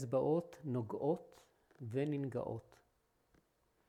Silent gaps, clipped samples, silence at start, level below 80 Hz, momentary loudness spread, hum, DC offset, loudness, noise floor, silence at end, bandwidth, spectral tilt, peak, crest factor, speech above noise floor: none; under 0.1%; 0 s; -76 dBFS; 10 LU; none; under 0.1%; -40 LUFS; -78 dBFS; 1.3 s; 13.5 kHz; -8.5 dB/octave; -24 dBFS; 18 dB; 39 dB